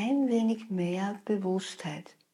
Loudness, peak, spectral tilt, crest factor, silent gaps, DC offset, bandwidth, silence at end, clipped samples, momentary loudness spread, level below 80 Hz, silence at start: -31 LUFS; -16 dBFS; -6.5 dB/octave; 14 dB; none; under 0.1%; 11.5 kHz; 0.3 s; under 0.1%; 12 LU; -84 dBFS; 0 s